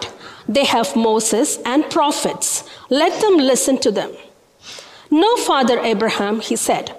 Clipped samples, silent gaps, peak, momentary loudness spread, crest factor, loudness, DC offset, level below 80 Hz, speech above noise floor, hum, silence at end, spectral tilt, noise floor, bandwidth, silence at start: under 0.1%; none; -6 dBFS; 14 LU; 12 dB; -17 LUFS; under 0.1%; -58 dBFS; 24 dB; none; 0 s; -2.5 dB/octave; -40 dBFS; 16 kHz; 0 s